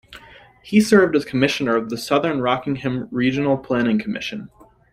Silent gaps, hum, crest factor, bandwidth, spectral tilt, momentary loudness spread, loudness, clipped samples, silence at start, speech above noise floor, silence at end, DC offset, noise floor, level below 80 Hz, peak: none; none; 18 dB; 15.5 kHz; -5.5 dB/octave; 10 LU; -20 LUFS; under 0.1%; 0.1 s; 27 dB; 0.45 s; under 0.1%; -46 dBFS; -54 dBFS; -2 dBFS